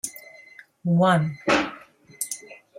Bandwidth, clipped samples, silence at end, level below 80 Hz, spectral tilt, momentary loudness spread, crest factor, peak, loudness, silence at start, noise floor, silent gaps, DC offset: 16.5 kHz; under 0.1%; 0.25 s; -60 dBFS; -5 dB/octave; 17 LU; 18 dB; -8 dBFS; -24 LUFS; 0.05 s; -49 dBFS; none; under 0.1%